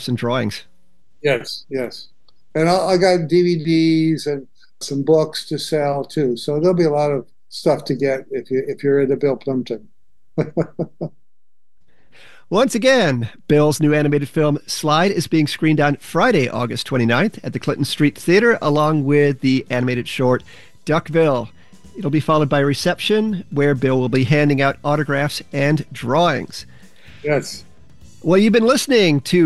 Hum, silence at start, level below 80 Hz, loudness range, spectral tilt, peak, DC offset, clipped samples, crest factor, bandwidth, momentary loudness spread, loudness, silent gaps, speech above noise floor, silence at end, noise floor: none; 0 s; -52 dBFS; 4 LU; -6 dB/octave; -2 dBFS; 1%; under 0.1%; 16 dB; 12.5 kHz; 11 LU; -18 LUFS; none; 66 dB; 0 s; -83 dBFS